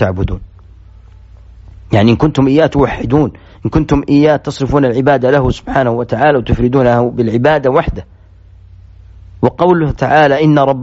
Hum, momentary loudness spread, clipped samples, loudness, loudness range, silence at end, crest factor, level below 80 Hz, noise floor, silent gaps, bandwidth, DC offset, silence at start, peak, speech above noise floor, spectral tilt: none; 7 LU; under 0.1%; -12 LUFS; 3 LU; 0 s; 12 dB; -30 dBFS; -39 dBFS; none; 8 kHz; under 0.1%; 0 s; 0 dBFS; 28 dB; -6.5 dB/octave